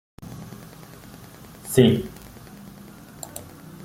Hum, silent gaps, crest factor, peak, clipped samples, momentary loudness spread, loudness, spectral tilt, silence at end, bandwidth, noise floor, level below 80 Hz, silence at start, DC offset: none; none; 24 dB; -2 dBFS; under 0.1%; 25 LU; -20 LUFS; -6 dB/octave; 0 s; 16.5 kHz; -44 dBFS; -52 dBFS; 0.2 s; under 0.1%